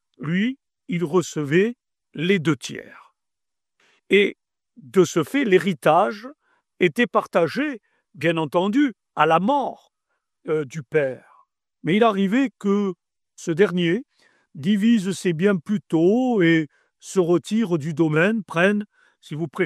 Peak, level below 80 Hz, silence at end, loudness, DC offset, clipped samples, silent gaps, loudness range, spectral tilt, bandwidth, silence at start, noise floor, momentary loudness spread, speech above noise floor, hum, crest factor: -2 dBFS; -70 dBFS; 0 s; -21 LUFS; under 0.1%; under 0.1%; none; 3 LU; -6 dB/octave; 13.5 kHz; 0.2 s; -88 dBFS; 12 LU; 67 dB; none; 20 dB